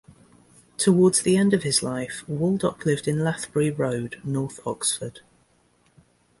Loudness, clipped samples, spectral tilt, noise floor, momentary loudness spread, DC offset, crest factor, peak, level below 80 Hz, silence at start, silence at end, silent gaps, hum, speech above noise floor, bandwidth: -23 LUFS; under 0.1%; -5 dB/octave; -63 dBFS; 12 LU; under 0.1%; 18 dB; -6 dBFS; -58 dBFS; 0.8 s; 1.2 s; none; none; 40 dB; 11.5 kHz